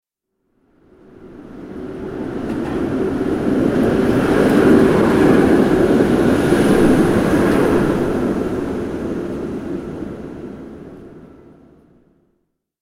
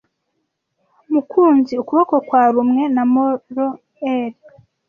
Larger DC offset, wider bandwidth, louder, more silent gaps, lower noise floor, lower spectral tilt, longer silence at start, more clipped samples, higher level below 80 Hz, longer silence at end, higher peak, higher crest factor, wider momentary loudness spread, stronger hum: neither; first, 16 kHz vs 5.6 kHz; about the same, -16 LUFS vs -16 LUFS; neither; about the same, -70 dBFS vs -72 dBFS; about the same, -7 dB/octave vs -7.5 dB/octave; about the same, 1.2 s vs 1.1 s; neither; first, -36 dBFS vs -66 dBFS; first, 1.55 s vs 0.55 s; about the same, 0 dBFS vs -2 dBFS; about the same, 16 dB vs 16 dB; first, 19 LU vs 9 LU; neither